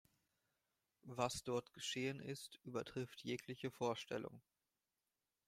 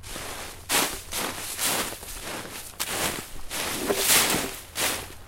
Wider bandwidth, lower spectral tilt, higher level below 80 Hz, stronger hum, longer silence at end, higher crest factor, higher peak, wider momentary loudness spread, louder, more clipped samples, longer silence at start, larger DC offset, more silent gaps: about the same, 16 kHz vs 16.5 kHz; first, -4.5 dB/octave vs -1 dB/octave; second, -78 dBFS vs -46 dBFS; neither; first, 1.05 s vs 0 s; about the same, 24 dB vs 22 dB; second, -24 dBFS vs -6 dBFS; second, 8 LU vs 16 LU; second, -46 LUFS vs -26 LUFS; neither; first, 1.05 s vs 0 s; neither; neither